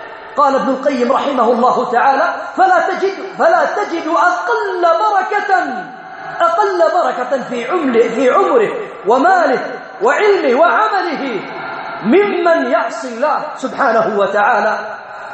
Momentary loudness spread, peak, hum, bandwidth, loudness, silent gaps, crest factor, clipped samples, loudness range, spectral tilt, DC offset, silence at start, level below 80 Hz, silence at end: 10 LU; 0 dBFS; none; 8.4 kHz; -14 LUFS; none; 14 dB; under 0.1%; 2 LU; -4.5 dB/octave; under 0.1%; 0 s; -64 dBFS; 0 s